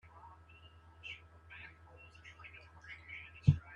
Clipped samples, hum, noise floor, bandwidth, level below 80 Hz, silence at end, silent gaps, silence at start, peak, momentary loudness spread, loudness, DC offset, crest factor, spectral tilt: under 0.1%; none; -60 dBFS; 7 kHz; -56 dBFS; 0 s; none; 0.15 s; -12 dBFS; 25 LU; -40 LUFS; under 0.1%; 28 dB; -8 dB/octave